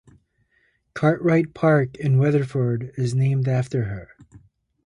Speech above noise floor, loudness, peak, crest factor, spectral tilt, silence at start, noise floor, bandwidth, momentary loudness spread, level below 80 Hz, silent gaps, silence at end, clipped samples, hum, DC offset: 45 dB; -21 LUFS; -6 dBFS; 16 dB; -8.5 dB/octave; 0.95 s; -66 dBFS; 10.5 kHz; 8 LU; -54 dBFS; none; 0.8 s; under 0.1%; none; under 0.1%